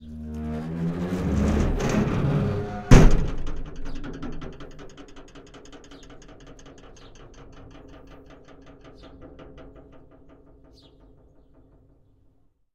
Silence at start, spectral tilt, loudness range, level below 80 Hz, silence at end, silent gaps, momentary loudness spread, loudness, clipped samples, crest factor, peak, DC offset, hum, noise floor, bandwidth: 0 s; -7 dB/octave; 25 LU; -30 dBFS; 3.05 s; none; 25 LU; -24 LUFS; under 0.1%; 26 dB; 0 dBFS; under 0.1%; none; -61 dBFS; 9.2 kHz